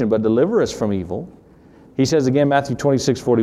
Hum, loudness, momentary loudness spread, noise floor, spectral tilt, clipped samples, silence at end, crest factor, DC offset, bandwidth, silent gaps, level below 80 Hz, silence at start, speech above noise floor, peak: none; -18 LUFS; 13 LU; -47 dBFS; -6 dB/octave; under 0.1%; 0 s; 14 dB; under 0.1%; 14 kHz; none; -50 dBFS; 0 s; 29 dB; -4 dBFS